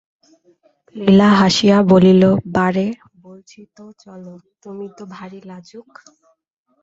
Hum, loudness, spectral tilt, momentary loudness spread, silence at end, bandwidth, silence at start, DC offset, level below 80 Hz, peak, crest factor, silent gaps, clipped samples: none; -13 LUFS; -6.5 dB/octave; 26 LU; 1 s; 7.8 kHz; 0.95 s; under 0.1%; -52 dBFS; -2 dBFS; 16 dB; none; under 0.1%